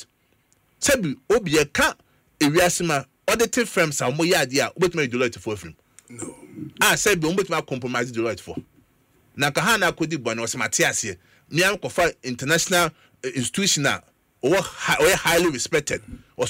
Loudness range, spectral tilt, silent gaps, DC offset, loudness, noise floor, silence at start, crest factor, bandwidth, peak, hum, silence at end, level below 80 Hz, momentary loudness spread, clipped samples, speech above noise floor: 3 LU; -3 dB/octave; none; under 0.1%; -21 LUFS; -64 dBFS; 0 s; 18 dB; 16.5 kHz; -6 dBFS; none; 0 s; -50 dBFS; 13 LU; under 0.1%; 42 dB